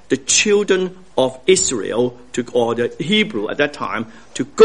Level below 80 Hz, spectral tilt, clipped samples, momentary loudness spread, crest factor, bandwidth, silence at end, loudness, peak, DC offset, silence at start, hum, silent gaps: -52 dBFS; -3 dB/octave; under 0.1%; 12 LU; 18 dB; 10.5 kHz; 0 s; -18 LUFS; 0 dBFS; 0.7%; 0.1 s; none; none